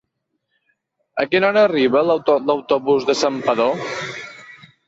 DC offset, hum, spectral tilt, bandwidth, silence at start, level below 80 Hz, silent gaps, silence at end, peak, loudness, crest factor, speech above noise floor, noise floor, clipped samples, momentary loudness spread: under 0.1%; none; -4.5 dB/octave; 8 kHz; 1.15 s; -62 dBFS; none; 0.35 s; -4 dBFS; -18 LUFS; 16 dB; 57 dB; -74 dBFS; under 0.1%; 14 LU